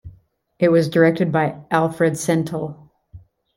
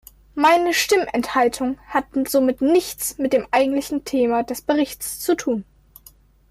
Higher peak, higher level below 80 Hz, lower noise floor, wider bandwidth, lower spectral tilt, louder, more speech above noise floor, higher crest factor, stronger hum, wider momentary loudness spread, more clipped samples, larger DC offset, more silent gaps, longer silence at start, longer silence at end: first, -2 dBFS vs -6 dBFS; about the same, -56 dBFS vs -52 dBFS; about the same, -53 dBFS vs -51 dBFS; about the same, 16.5 kHz vs 16 kHz; first, -6.5 dB/octave vs -3 dB/octave; about the same, -19 LUFS vs -20 LUFS; first, 35 dB vs 31 dB; about the same, 18 dB vs 14 dB; neither; about the same, 9 LU vs 8 LU; neither; neither; neither; second, 0.05 s vs 0.35 s; second, 0.4 s vs 0.9 s